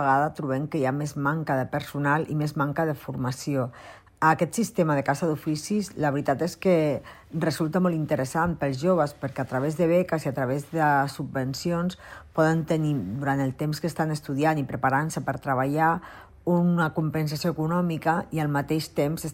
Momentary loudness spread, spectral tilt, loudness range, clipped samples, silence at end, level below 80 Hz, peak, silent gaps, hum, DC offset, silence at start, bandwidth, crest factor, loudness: 7 LU; -6.5 dB/octave; 2 LU; under 0.1%; 0 s; -56 dBFS; -8 dBFS; none; none; under 0.1%; 0 s; 16 kHz; 18 dB; -26 LUFS